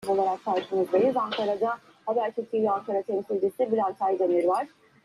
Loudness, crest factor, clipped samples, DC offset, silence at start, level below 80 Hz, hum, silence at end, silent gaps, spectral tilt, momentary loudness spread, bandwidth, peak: -27 LUFS; 14 dB; under 0.1%; under 0.1%; 0 s; -74 dBFS; none; 0.35 s; none; -6 dB/octave; 6 LU; 12.5 kHz; -12 dBFS